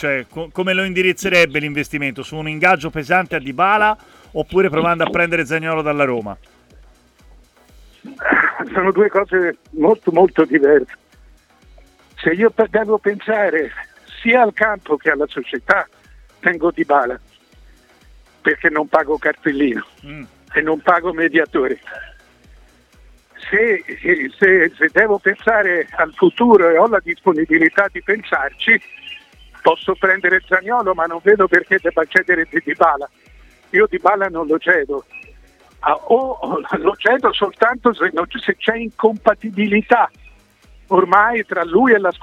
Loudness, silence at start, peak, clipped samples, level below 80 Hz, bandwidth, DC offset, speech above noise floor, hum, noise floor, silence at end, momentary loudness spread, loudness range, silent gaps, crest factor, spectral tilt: -16 LUFS; 0 s; 0 dBFS; under 0.1%; -48 dBFS; 14 kHz; under 0.1%; 33 dB; none; -49 dBFS; 0.05 s; 10 LU; 5 LU; none; 16 dB; -5.5 dB/octave